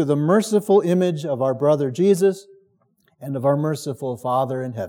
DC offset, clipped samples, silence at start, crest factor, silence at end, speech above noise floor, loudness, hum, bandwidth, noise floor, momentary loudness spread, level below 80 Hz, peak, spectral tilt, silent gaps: under 0.1%; under 0.1%; 0 s; 16 dB; 0 s; 44 dB; -20 LUFS; none; 17 kHz; -63 dBFS; 10 LU; -80 dBFS; -4 dBFS; -7 dB/octave; none